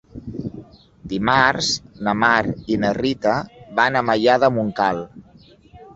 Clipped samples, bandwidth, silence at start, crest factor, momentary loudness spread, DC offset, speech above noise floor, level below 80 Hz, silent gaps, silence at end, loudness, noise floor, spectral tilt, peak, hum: under 0.1%; 8.2 kHz; 0.15 s; 20 dB; 15 LU; under 0.1%; 31 dB; -48 dBFS; none; 0.05 s; -19 LUFS; -49 dBFS; -4.5 dB/octave; -2 dBFS; none